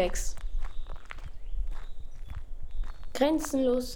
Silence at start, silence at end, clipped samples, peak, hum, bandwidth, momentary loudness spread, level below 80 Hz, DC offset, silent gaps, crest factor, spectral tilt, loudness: 0 s; 0 s; under 0.1%; -12 dBFS; none; 17 kHz; 19 LU; -36 dBFS; under 0.1%; none; 18 dB; -4.5 dB/octave; -32 LUFS